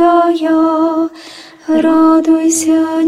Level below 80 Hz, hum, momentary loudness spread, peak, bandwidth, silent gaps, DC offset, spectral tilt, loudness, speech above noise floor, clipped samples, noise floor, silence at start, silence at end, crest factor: -54 dBFS; none; 15 LU; 0 dBFS; 13.5 kHz; none; under 0.1%; -3.5 dB/octave; -11 LUFS; 24 dB; under 0.1%; -34 dBFS; 0 s; 0 s; 10 dB